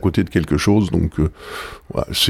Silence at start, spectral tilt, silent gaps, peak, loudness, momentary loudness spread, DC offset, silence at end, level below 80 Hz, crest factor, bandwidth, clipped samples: 0 s; -5.5 dB/octave; none; -2 dBFS; -19 LUFS; 14 LU; under 0.1%; 0 s; -32 dBFS; 16 dB; 16.5 kHz; under 0.1%